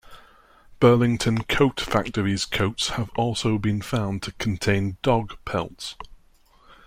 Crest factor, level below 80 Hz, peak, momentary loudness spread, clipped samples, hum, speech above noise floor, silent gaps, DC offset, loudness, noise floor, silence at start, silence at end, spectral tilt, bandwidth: 20 dB; -44 dBFS; -4 dBFS; 10 LU; under 0.1%; none; 33 dB; none; under 0.1%; -23 LUFS; -56 dBFS; 0.1 s; 0.7 s; -5.5 dB/octave; 16 kHz